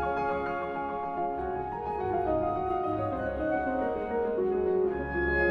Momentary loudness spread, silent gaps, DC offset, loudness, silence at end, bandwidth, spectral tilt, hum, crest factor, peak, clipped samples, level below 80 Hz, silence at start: 5 LU; none; under 0.1%; -30 LUFS; 0 s; 5.4 kHz; -9 dB/octave; none; 14 dB; -16 dBFS; under 0.1%; -46 dBFS; 0 s